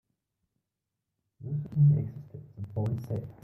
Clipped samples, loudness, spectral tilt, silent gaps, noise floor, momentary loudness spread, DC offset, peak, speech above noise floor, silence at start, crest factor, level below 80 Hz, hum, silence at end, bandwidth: under 0.1%; -29 LUFS; -11.5 dB/octave; none; -86 dBFS; 22 LU; under 0.1%; -14 dBFS; 57 dB; 1.4 s; 16 dB; -62 dBFS; none; 0.1 s; 2.3 kHz